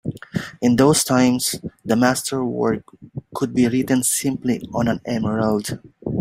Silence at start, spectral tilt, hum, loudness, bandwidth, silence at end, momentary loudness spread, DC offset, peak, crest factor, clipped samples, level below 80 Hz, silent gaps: 0.05 s; -4.5 dB/octave; none; -20 LUFS; 16 kHz; 0 s; 14 LU; under 0.1%; -2 dBFS; 18 dB; under 0.1%; -52 dBFS; none